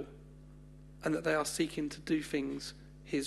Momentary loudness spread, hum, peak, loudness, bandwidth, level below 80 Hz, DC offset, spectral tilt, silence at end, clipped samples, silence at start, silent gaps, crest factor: 23 LU; 50 Hz at -55 dBFS; -18 dBFS; -35 LUFS; 12.5 kHz; -58 dBFS; under 0.1%; -4.5 dB/octave; 0 s; under 0.1%; 0 s; none; 18 dB